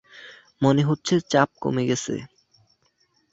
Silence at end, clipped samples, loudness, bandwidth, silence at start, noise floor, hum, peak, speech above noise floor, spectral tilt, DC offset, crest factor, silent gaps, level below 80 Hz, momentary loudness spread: 1.05 s; under 0.1%; -23 LUFS; 8 kHz; 0.15 s; -66 dBFS; none; -2 dBFS; 45 dB; -5.5 dB/octave; under 0.1%; 22 dB; none; -60 dBFS; 13 LU